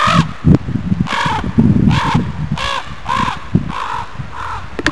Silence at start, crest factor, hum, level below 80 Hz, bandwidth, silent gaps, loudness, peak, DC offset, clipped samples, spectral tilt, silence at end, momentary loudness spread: 0 s; 16 dB; none; -30 dBFS; 11 kHz; none; -16 LUFS; 0 dBFS; 4%; under 0.1%; -6 dB/octave; 0 s; 12 LU